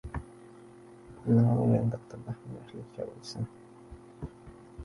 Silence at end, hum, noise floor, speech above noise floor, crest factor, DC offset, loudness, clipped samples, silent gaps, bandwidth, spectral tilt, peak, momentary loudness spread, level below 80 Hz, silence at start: 0 s; none; -52 dBFS; 22 dB; 18 dB; under 0.1%; -31 LUFS; under 0.1%; none; 11 kHz; -9 dB/octave; -14 dBFS; 27 LU; -52 dBFS; 0.05 s